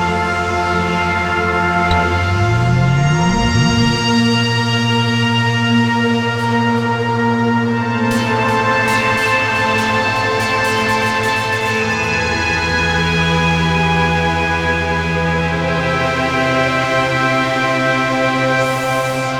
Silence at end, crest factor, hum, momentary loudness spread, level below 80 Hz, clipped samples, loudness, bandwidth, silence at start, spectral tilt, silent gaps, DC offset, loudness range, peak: 0 s; 14 dB; none; 3 LU; -34 dBFS; under 0.1%; -15 LUFS; 17 kHz; 0 s; -5 dB/octave; none; under 0.1%; 1 LU; -2 dBFS